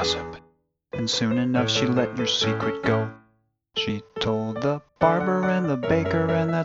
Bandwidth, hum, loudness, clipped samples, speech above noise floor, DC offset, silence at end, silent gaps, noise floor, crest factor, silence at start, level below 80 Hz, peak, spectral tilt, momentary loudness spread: 8 kHz; none; -24 LUFS; under 0.1%; 43 dB; under 0.1%; 0 s; none; -66 dBFS; 20 dB; 0 s; -52 dBFS; -4 dBFS; -5 dB/octave; 8 LU